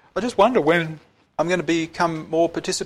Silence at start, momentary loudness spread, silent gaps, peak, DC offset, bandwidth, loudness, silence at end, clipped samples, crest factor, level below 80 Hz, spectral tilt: 0.15 s; 12 LU; none; -4 dBFS; under 0.1%; 13.5 kHz; -21 LUFS; 0 s; under 0.1%; 16 dB; -54 dBFS; -4.5 dB/octave